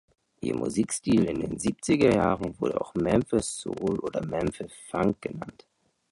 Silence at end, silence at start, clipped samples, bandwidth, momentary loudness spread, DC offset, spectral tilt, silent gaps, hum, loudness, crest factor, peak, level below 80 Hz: 0.6 s; 0.4 s; under 0.1%; 11.5 kHz; 12 LU; under 0.1%; -5.5 dB/octave; none; none; -27 LUFS; 20 dB; -8 dBFS; -50 dBFS